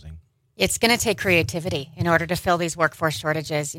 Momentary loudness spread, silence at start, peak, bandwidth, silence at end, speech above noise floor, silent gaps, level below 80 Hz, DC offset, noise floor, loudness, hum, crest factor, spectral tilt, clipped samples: 7 LU; 0.05 s; -4 dBFS; 16.5 kHz; 0 s; 23 dB; none; -48 dBFS; under 0.1%; -45 dBFS; -22 LUFS; none; 20 dB; -4 dB/octave; under 0.1%